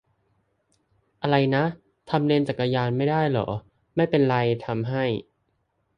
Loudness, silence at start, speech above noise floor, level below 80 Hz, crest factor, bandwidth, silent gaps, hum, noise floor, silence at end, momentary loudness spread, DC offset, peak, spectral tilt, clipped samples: -24 LUFS; 1.2 s; 49 dB; -58 dBFS; 18 dB; 9.8 kHz; none; none; -72 dBFS; 0.75 s; 10 LU; under 0.1%; -6 dBFS; -8.5 dB/octave; under 0.1%